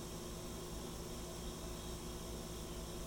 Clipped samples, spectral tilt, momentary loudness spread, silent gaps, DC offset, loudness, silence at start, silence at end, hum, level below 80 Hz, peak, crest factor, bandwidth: under 0.1%; -4 dB/octave; 0 LU; none; under 0.1%; -47 LUFS; 0 s; 0 s; none; -52 dBFS; -34 dBFS; 12 dB; 19.5 kHz